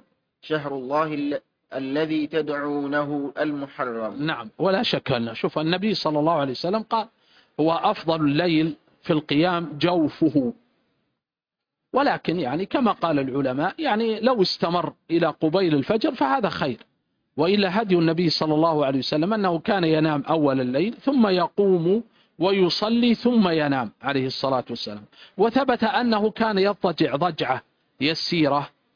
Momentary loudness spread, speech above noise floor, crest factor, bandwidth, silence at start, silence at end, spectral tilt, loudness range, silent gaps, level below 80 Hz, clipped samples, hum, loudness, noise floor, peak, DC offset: 8 LU; 66 dB; 16 dB; 5.2 kHz; 0.45 s; 0.3 s; -7 dB/octave; 4 LU; none; -62 dBFS; under 0.1%; none; -23 LUFS; -88 dBFS; -6 dBFS; under 0.1%